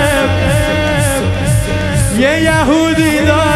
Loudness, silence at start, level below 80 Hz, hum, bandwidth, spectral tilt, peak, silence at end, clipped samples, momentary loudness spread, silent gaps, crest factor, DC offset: -12 LUFS; 0 s; -24 dBFS; none; 13.5 kHz; -5 dB/octave; 0 dBFS; 0 s; under 0.1%; 3 LU; none; 12 dB; under 0.1%